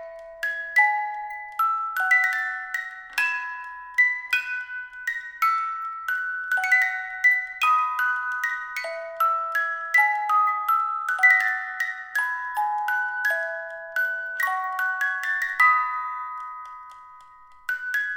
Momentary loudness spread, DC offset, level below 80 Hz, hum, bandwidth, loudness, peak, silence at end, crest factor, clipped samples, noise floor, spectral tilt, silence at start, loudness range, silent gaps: 12 LU; under 0.1%; -70 dBFS; none; over 20 kHz; -23 LUFS; -6 dBFS; 0 s; 18 dB; under 0.1%; -49 dBFS; 2 dB/octave; 0 s; 4 LU; none